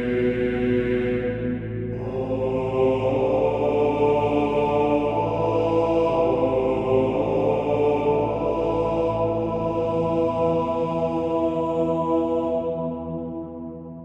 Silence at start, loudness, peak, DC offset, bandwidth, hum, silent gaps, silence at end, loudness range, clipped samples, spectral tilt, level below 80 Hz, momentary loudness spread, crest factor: 0 s; -23 LUFS; -8 dBFS; under 0.1%; 8 kHz; none; none; 0 s; 3 LU; under 0.1%; -8.5 dB/octave; -44 dBFS; 8 LU; 14 dB